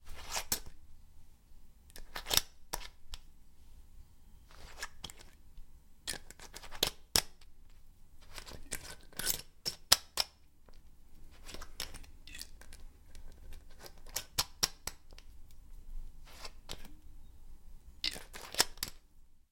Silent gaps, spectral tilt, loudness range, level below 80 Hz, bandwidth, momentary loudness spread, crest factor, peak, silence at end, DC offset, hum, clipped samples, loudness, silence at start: none; -0.5 dB/octave; 14 LU; -52 dBFS; 17 kHz; 25 LU; 42 dB; 0 dBFS; 0.1 s; under 0.1%; none; under 0.1%; -36 LUFS; 0 s